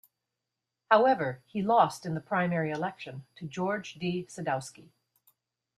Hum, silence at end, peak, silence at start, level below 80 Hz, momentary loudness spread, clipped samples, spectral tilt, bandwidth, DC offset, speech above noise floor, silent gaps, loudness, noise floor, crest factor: none; 0.95 s; -6 dBFS; 0.9 s; -72 dBFS; 17 LU; under 0.1%; -6 dB/octave; 14.5 kHz; under 0.1%; 58 dB; none; -29 LUFS; -87 dBFS; 24 dB